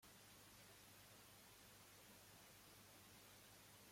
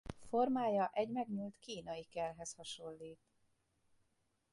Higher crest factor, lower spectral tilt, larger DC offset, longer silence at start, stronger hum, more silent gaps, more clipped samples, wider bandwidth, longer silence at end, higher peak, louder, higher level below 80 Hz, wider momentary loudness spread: about the same, 14 dB vs 18 dB; second, -2.5 dB/octave vs -5 dB/octave; neither; about the same, 0 s vs 0.05 s; first, 50 Hz at -75 dBFS vs none; neither; neither; first, 16.5 kHz vs 11.5 kHz; second, 0 s vs 1.4 s; second, -52 dBFS vs -24 dBFS; second, -64 LUFS vs -40 LUFS; second, -84 dBFS vs -68 dBFS; second, 0 LU vs 14 LU